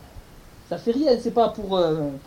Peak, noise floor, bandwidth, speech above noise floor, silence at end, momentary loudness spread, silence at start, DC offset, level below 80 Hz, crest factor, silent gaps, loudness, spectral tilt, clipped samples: -6 dBFS; -46 dBFS; 16 kHz; 24 dB; 0.05 s; 7 LU; 0.05 s; under 0.1%; -48 dBFS; 16 dB; none; -22 LUFS; -7 dB/octave; under 0.1%